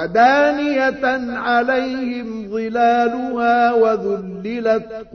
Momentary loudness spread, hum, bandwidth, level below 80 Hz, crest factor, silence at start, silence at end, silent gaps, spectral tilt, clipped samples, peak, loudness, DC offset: 11 LU; none; 6.6 kHz; -52 dBFS; 14 dB; 0 s; 0.1 s; none; -5.5 dB/octave; under 0.1%; -2 dBFS; -18 LUFS; under 0.1%